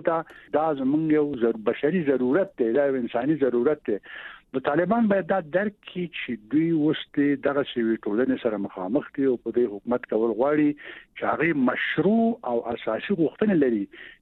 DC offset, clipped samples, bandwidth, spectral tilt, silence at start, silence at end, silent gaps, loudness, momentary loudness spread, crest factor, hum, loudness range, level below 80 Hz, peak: under 0.1%; under 0.1%; 4.2 kHz; -9.5 dB/octave; 0 s; 0.15 s; none; -25 LUFS; 9 LU; 16 dB; none; 2 LU; -64 dBFS; -8 dBFS